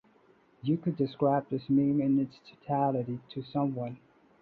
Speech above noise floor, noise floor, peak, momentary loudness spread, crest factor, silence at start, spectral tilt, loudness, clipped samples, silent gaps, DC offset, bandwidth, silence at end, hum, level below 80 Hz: 34 dB; -63 dBFS; -14 dBFS; 12 LU; 16 dB; 0.65 s; -10.5 dB/octave; -30 LUFS; under 0.1%; none; under 0.1%; 4.7 kHz; 0.45 s; none; -68 dBFS